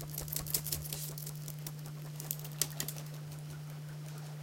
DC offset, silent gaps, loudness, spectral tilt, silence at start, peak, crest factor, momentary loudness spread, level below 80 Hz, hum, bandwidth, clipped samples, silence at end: under 0.1%; none; -39 LUFS; -3.5 dB/octave; 0 s; -10 dBFS; 32 dB; 11 LU; -60 dBFS; none; 17 kHz; under 0.1%; 0 s